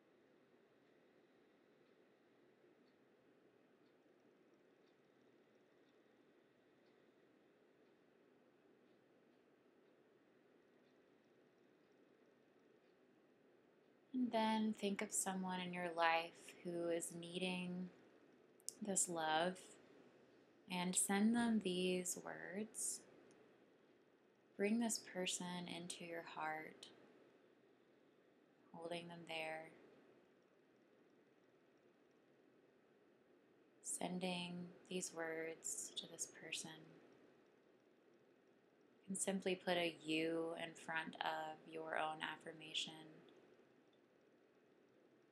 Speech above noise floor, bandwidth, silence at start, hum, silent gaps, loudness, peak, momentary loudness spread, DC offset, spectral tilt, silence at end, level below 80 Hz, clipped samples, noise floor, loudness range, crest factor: 29 dB; 14.5 kHz; 14.15 s; none; none; -44 LUFS; -22 dBFS; 14 LU; under 0.1%; -3 dB/octave; 1.95 s; under -90 dBFS; under 0.1%; -74 dBFS; 12 LU; 26 dB